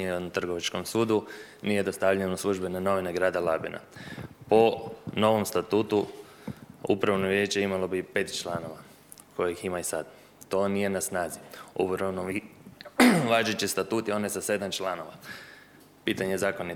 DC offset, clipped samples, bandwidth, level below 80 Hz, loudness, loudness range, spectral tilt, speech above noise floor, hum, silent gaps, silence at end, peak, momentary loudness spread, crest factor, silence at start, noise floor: under 0.1%; under 0.1%; 19.5 kHz; -64 dBFS; -28 LUFS; 5 LU; -4.5 dB/octave; 26 dB; none; none; 0 s; -4 dBFS; 17 LU; 24 dB; 0 s; -54 dBFS